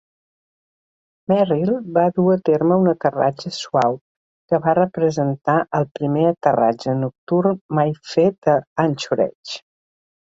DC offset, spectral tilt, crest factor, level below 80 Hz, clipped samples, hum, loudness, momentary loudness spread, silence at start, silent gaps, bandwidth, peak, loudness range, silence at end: under 0.1%; -7 dB/octave; 18 dB; -62 dBFS; under 0.1%; none; -19 LUFS; 6 LU; 1.3 s; 4.01-4.48 s, 5.91-5.95 s, 7.18-7.27 s, 7.61-7.69 s, 8.38-8.42 s, 8.67-8.76 s, 9.35-9.43 s; 7.8 kHz; -2 dBFS; 2 LU; 0.8 s